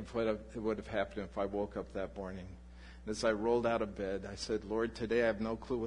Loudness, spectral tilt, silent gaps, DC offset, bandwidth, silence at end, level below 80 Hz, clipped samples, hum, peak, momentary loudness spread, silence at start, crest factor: -36 LUFS; -5.5 dB/octave; none; under 0.1%; 11 kHz; 0 s; -54 dBFS; under 0.1%; none; -16 dBFS; 13 LU; 0 s; 20 dB